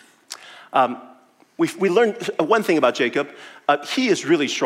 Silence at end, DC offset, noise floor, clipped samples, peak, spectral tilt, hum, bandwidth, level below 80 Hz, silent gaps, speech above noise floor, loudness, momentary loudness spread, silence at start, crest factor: 0 s; under 0.1%; -52 dBFS; under 0.1%; -4 dBFS; -4 dB/octave; none; 16 kHz; -78 dBFS; none; 32 dB; -20 LUFS; 18 LU; 0.3 s; 18 dB